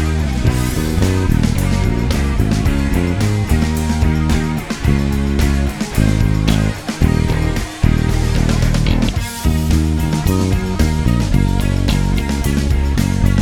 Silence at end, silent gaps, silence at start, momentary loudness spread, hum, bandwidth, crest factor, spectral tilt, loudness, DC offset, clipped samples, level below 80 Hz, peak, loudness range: 0 s; none; 0 s; 3 LU; none; 18 kHz; 14 dB; -6 dB/octave; -16 LUFS; under 0.1%; under 0.1%; -18 dBFS; 0 dBFS; 0 LU